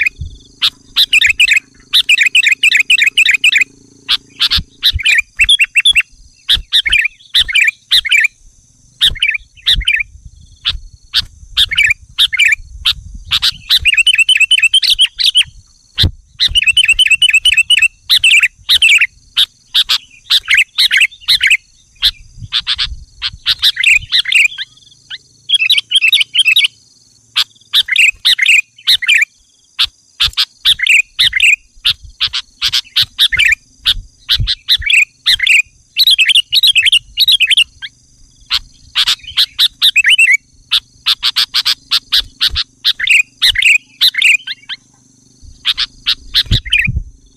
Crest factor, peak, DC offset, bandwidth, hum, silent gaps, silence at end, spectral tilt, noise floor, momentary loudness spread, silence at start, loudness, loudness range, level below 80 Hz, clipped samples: 12 dB; 0 dBFS; under 0.1%; 16 kHz; none; none; 0.25 s; 1 dB/octave; -50 dBFS; 9 LU; 0 s; -9 LUFS; 4 LU; -34 dBFS; under 0.1%